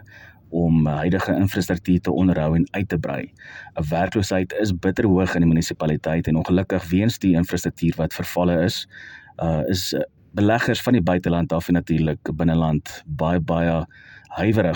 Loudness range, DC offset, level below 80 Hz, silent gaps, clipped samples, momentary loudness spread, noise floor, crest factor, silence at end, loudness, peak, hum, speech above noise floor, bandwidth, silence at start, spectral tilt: 2 LU; under 0.1%; -44 dBFS; none; under 0.1%; 10 LU; -46 dBFS; 16 dB; 0 s; -21 LUFS; -6 dBFS; none; 25 dB; 17.5 kHz; 0.15 s; -6.5 dB/octave